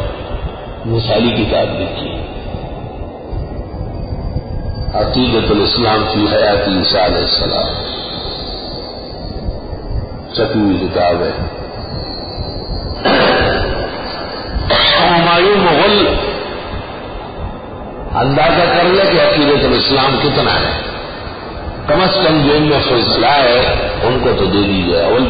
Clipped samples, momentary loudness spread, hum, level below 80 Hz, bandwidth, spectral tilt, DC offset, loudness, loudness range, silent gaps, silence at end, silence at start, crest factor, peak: under 0.1%; 16 LU; none; -28 dBFS; 5.2 kHz; -10 dB/octave; under 0.1%; -13 LUFS; 7 LU; none; 0 s; 0 s; 14 dB; 0 dBFS